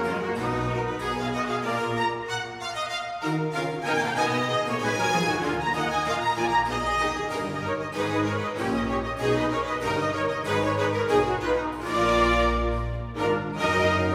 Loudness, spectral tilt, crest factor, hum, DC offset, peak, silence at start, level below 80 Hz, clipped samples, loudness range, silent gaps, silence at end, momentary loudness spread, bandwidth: -26 LUFS; -5 dB/octave; 16 dB; none; under 0.1%; -10 dBFS; 0 s; -40 dBFS; under 0.1%; 3 LU; none; 0 s; 6 LU; 16.5 kHz